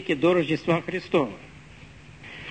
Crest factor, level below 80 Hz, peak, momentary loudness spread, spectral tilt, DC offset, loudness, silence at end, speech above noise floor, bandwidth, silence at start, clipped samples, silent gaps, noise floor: 18 dB; -56 dBFS; -10 dBFS; 22 LU; -7 dB/octave; 0.1%; -24 LUFS; 0 s; 23 dB; 9 kHz; 0 s; under 0.1%; none; -47 dBFS